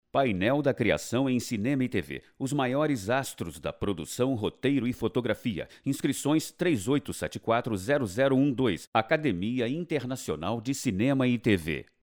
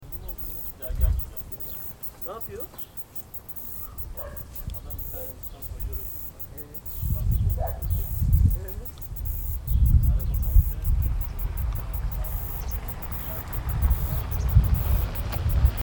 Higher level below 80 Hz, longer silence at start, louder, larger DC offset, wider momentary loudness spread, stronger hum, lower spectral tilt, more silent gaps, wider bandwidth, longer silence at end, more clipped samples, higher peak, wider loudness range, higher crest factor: second, -56 dBFS vs -28 dBFS; first, 0.15 s vs 0 s; about the same, -28 LUFS vs -28 LUFS; neither; second, 8 LU vs 12 LU; neither; second, -5.5 dB/octave vs -7 dB/octave; first, 8.87-8.92 s vs none; about the same, over 20 kHz vs 19.5 kHz; first, 0.2 s vs 0 s; neither; second, -10 dBFS vs -4 dBFS; second, 2 LU vs 8 LU; about the same, 18 dB vs 20 dB